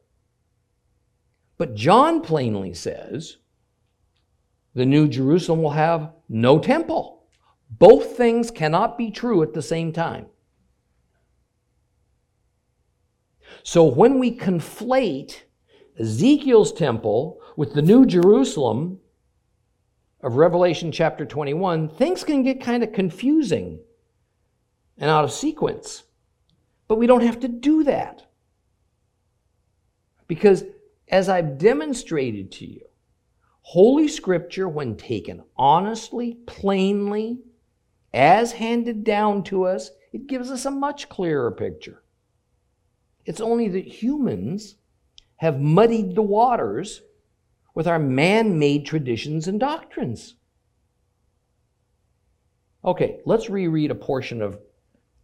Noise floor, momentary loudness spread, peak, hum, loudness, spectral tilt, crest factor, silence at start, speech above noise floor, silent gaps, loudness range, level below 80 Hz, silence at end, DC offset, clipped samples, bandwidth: -69 dBFS; 16 LU; 0 dBFS; none; -20 LUFS; -6.5 dB/octave; 22 dB; 1.6 s; 50 dB; none; 9 LU; -54 dBFS; 0.65 s; under 0.1%; under 0.1%; 13.5 kHz